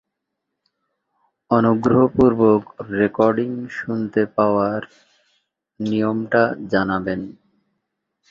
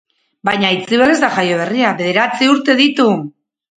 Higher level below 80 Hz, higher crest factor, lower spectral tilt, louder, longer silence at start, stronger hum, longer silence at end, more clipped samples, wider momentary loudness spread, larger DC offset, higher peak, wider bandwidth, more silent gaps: first, -52 dBFS vs -58 dBFS; about the same, 18 dB vs 14 dB; first, -8.5 dB/octave vs -4.5 dB/octave; second, -19 LUFS vs -13 LUFS; first, 1.5 s vs 0.45 s; neither; first, 1 s vs 0.45 s; neither; first, 12 LU vs 7 LU; neither; about the same, -2 dBFS vs 0 dBFS; second, 7.2 kHz vs 9.4 kHz; neither